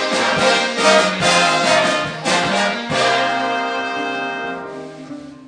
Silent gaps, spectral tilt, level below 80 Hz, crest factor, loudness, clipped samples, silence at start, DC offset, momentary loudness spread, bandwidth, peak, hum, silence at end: none; -2.5 dB/octave; -54 dBFS; 16 dB; -16 LUFS; under 0.1%; 0 s; under 0.1%; 15 LU; 10.5 kHz; 0 dBFS; none; 0.05 s